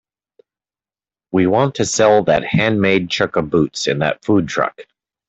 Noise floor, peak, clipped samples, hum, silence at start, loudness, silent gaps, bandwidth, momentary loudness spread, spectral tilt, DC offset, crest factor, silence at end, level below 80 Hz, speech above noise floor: under -90 dBFS; -2 dBFS; under 0.1%; none; 1.35 s; -16 LUFS; none; 8.4 kHz; 7 LU; -5 dB/octave; under 0.1%; 16 dB; 0.45 s; -50 dBFS; over 74 dB